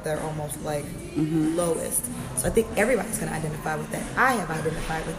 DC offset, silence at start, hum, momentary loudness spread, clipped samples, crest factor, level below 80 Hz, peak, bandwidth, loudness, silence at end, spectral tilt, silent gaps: under 0.1%; 0 s; none; 8 LU; under 0.1%; 20 dB; -42 dBFS; -6 dBFS; 15.5 kHz; -26 LUFS; 0 s; -4.5 dB/octave; none